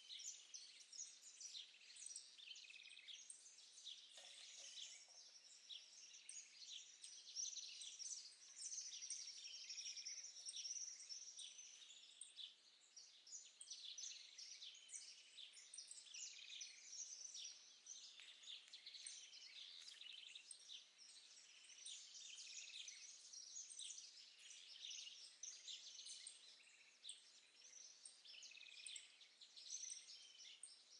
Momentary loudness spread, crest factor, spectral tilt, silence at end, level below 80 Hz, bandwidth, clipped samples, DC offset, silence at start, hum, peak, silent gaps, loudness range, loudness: 10 LU; 20 dB; 5 dB/octave; 0 s; under -90 dBFS; 11 kHz; under 0.1%; under 0.1%; 0 s; none; -40 dBFS; none; 6 LU; -55 LUFS